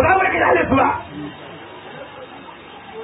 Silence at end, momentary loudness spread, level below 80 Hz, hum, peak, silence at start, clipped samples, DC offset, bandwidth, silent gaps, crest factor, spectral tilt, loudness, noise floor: 0 s; 22 LU; -42 dBFS; none; -4 dBFS; 0 s; under 0.1%; under 0.1%; 4 kHz; none; 16 dB; -11 dB/octave; -16 LUFS; -38 dBFS